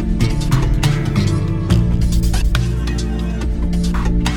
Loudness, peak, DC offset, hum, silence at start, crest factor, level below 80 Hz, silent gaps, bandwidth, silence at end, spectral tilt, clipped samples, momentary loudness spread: -18 LUFS; -2 dBFS; under 0.1%; none; 0 s; 14 dB; -18 dBFS; none; 17.5 kHz; 0 s; -6 dB/octave; under 0.1%; 5 LU